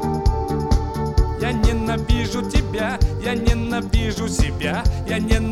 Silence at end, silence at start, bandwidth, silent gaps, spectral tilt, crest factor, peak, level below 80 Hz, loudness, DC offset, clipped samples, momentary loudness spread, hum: 0 s; 0 s; 13.5 kHz; none; -6 dB/octave; 18 dB; -2 dBFS; -22 dBFS; -21 LUFS; under 0.1%; under 0.1%; 3 LU; none